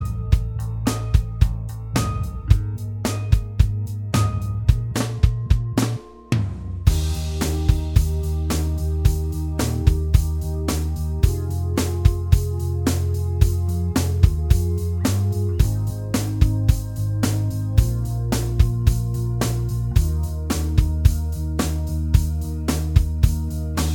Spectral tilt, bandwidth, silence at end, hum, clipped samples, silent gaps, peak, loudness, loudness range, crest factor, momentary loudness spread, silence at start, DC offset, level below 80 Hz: -6 dB/octave; 18.5 kHz; 0 s; none; under 0.1%; none; 0 dBFS; -22 LUFS; 2 LU; 20 dB; 6 LU; 0 s; under 0.1%; -24 dBFS